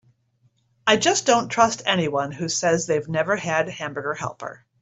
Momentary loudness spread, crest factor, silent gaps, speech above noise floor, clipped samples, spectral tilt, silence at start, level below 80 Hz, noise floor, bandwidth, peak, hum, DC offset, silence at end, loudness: 11 LU; 20 dB; none; 42 dB; under 0.1%; -3 dB/octave; 0.85 s; -60 dBFS; -65 dBFS; 8.2 kHz; -2 dBFS; none; under 0.1%; 0.25 s; -22 LUFS